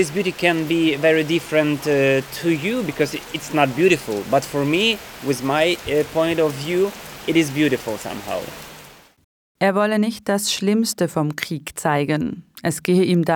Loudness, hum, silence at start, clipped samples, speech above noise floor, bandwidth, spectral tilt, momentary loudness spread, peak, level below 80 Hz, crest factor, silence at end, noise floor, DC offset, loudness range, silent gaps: -20 LUFS; none; 0 s; under 0.1%; 25 dB; 19.5 kHz; -5 dB/octave; 10 LU; -2 dBFS; -54 dBFS; 18 dB; 0 s; -45 dBFS; under 0.1%; 3 LU; 9.24-9.55 s